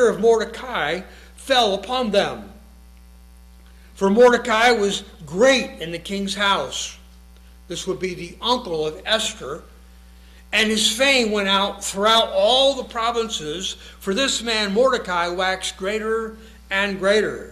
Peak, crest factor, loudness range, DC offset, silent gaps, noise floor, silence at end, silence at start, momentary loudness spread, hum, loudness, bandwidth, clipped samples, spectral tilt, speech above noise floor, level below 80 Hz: -4 dBFS; 18 dB; 6 LU; under 0.1%; none; -45 dBFS; 0 s; 0 s; 13 LU; none; -20 LUFS; 14.5 kHz; under 0.1%; -3 dB/octave; 25 dB; -46 dBFS